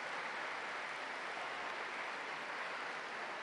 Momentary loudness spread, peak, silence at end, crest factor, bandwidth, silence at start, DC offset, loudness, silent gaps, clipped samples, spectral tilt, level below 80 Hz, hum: 1 LU; -30 dBFS; 0 s; 14 dB; 11.5 kHz; 0 s; under 0.1%; -42 LUFS; none; under 0.1%; -1.5 dB/octave; -86 dBFS; none